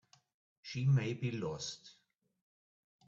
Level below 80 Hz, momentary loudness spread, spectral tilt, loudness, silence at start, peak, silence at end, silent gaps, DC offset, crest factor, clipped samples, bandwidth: -72 dBFS; 17 LU; -6 dB/octave; -36 LUFS; 0.65 s; -22 dBFS; 1.15 s; none; under 0.1%; 16 dB; under 0.1%; 7.6 kHz